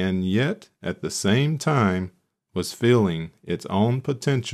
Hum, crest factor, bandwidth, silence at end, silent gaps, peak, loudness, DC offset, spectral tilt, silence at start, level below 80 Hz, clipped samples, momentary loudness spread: none; 16 dB; 14 kHz; 0 s; none; -8 dBFS; -24 LUFS; under 0.1%; -6 dB/octave; 0 s; -58 dBFS; under 0.1%; 12 LU